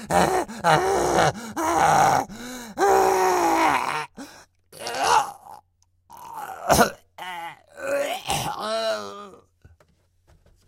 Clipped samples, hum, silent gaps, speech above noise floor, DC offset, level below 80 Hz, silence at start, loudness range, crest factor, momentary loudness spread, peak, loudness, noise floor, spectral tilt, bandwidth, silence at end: under 0.1%; none; none; 44 dB; under 0.1%; -50 dBFS; 0 s; 8 LU; 22 dB; 18 LU; -2 dBFS; -22 LUFS; -64 dBFS; -3.5 dB/octave; 16.5 kHz; 1.35 s